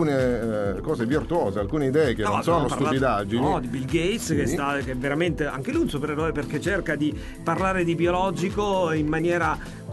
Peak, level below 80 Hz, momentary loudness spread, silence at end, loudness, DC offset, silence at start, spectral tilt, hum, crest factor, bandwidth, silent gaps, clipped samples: -10 dBFS; -40 dBFS; 5 LU; 0 s; -24 LUFS; under 0.1%; 0 s; -6 dB/octave; none; 14 dB; 12 kHz; none; under 0.1%